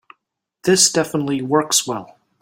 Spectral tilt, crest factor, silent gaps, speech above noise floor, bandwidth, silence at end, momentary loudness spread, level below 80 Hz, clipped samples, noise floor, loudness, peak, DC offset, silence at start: -2.5 dB/octave; 20 dB; none; 56 dB; 16.5 kHz; 0.35 s; 12 LU; -62 dBFS; under 0.1%; -74 dBFS; -17 LUFS; 0 dBFS; under 0.1%; 0.65 s